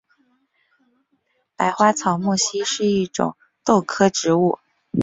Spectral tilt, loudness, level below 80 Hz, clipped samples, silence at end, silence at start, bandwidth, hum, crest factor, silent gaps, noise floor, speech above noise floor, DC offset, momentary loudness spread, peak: -4.5 dB/octave; -20 LUFS; -60 dBFS; under 0.1%; 0 s; 1.6 s; 8.2 kHz; none; 20 dB; none; -68 dBFS; 49 dB; under 0.1%; 9 LU; -2 dBFS